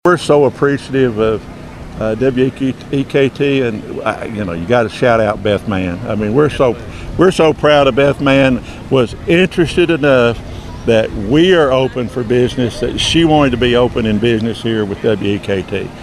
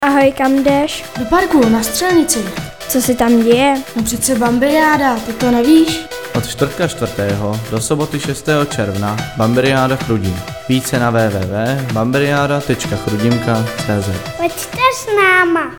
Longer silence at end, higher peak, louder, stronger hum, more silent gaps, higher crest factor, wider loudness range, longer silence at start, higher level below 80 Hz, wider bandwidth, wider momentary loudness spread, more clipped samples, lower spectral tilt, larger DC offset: about the same, 0 s vs 0 s; about the same, 0 dBFS vs 0 dBFS; about the same, -13 LUFS vs -14 LUFS; neither; neither; about the same, 14 dB vs 14 dB; about the same, 4 LU vs 3 LU; about the same, 0.05 s vs 0 s; first, -34 dBFS vs -40 dBFS; second, 13 kHz vs 19.5 kHz; about the same, 10 LU vs 8 LU; neither; about the same, -6 dB/octave vs -5 dB/octave; second, under 0.1% vs 0.7%